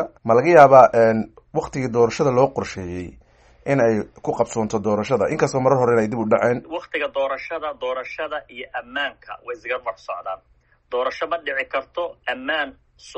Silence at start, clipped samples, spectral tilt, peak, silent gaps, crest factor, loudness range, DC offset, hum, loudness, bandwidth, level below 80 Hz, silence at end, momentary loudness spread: 0 s; under 0.1%; -6 dB/octave; 0 dBFS; none; 20 dB; 11 LU; under 0.1%; none; -20 LUFS; 8.4 kHz; -54 dBFS; 0.05 s; 16 LU